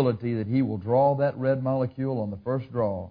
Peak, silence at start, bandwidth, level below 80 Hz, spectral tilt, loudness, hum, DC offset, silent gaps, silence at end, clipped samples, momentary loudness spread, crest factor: -10 dBFS; 0 s; 5 kHz; -62 dBFS; -12 dB/octave; -26 LUFS; none; under 0.1%; none; 0 s; under 0.1%; 7 LU; 16 dB